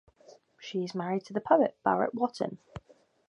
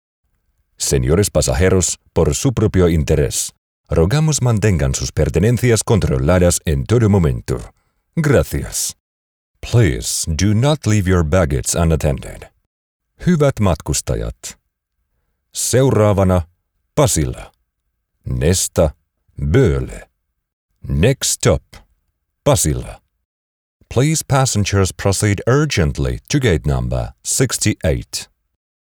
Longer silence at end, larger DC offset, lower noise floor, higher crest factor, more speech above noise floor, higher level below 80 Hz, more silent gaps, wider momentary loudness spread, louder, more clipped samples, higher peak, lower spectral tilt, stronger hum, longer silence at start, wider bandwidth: second, 0.5 s vs 0.7 s; neither; second, -58 dBFS vs -72 dBFS; first, 22 dB vs 14 dB; second, 29 dB vs 57 dB; second, -66 dBFS vs -30 dBFS; second, none vs 3.58-3.84 s, 9.00-9.55 s, 12.66-13.00 s, 20.53-20.69 s, 23.25-23.80 s; first, 22 LU vs 11 LU; second, -30 LUFS vs -16 LUFS; neither; second, -10 dBFS vs -2 dBFS; first, -6.5 dB/octave vs -5 dB/octave; neither; second, 0.3 s vs 0.8 s; second, 10.5 kHz vs over 20 kHz